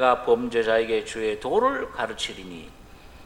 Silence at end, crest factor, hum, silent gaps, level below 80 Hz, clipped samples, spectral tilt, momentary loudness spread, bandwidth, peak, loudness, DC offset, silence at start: 0 s; 20 dB; none; none; -50 dBFS; under 0.1%; -4 dB/octave; 13 LU; 12 kHz; -6 dBFS; -24 LUFS; under 0.1%; 0 s